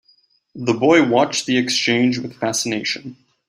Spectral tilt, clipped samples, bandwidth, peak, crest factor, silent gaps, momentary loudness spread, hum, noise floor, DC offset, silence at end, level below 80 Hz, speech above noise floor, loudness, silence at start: -3.5 dB/octave; under 0.1%; 15 kHz; -2 dBFS; 18 dB; none; 11 LU; none; -59 dBFS; under 0.1%; 0.35 s; -62 dBFS; 41 dB; -18 LUFS; 0.55 s